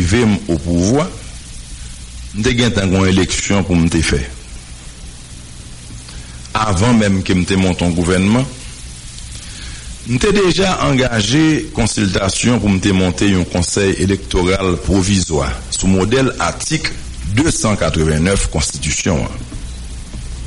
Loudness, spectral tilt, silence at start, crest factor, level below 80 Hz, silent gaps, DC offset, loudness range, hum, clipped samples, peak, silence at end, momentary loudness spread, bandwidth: -15 LUFS; -5 dB/octave; 0 s; 14 dB; -28 dBFS; none; under 0.1%; 3 LU; none; under 0.1%; -2 dBFS; 0 s; 18 LU; 11.5 kHz